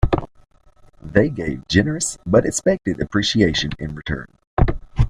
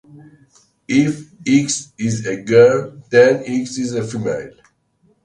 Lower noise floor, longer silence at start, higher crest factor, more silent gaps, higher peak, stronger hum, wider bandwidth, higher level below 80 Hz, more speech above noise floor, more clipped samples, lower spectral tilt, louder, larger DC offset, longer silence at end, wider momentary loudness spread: second, -50 dBFS vs -60 dBFS; second, 0 s vs 0.15 s; about the same, 20 dB vs 18 dB; first, 4.47-4.57 s vs none; about the same, 0 dBFS vs 0 dBFS; neither; first, 15 kHz vs 10.5 kHz; first, -30 dBFS vs -56 dBFS; second, 30 dB vs 44 dB; neither; about the same, -5 dB/octave vs -5 dB/octave; second, -20 LUFS vs -17 LUFS; neither; second, 0 s vs 0.75 s; about the same, 11 LU vs 12 LU